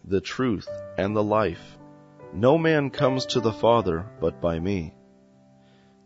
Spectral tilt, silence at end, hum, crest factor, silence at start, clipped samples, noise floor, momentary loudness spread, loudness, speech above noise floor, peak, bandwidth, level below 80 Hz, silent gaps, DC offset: -6.5 dB/octave; 1.15 s; none; 20 dB; 0.05 s; under 0.1%; -56 dBFS; 11 LU; -24 LUFS; 32 dB; -6 dBFS; 8 kHz; -50 dBFS; none; under 0.1%